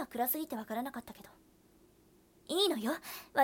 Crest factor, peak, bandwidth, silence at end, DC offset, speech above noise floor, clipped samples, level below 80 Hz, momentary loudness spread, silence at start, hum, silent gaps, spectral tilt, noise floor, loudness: 20 dB; -16 dBFS; 18 kHz; 0 s; under 0.1%; 30 dB; under 0.1%; -72 dBFS; 16 LU; 0 s; none; none; -2.5 dB/octave; -65 dBFS; -35 LUFS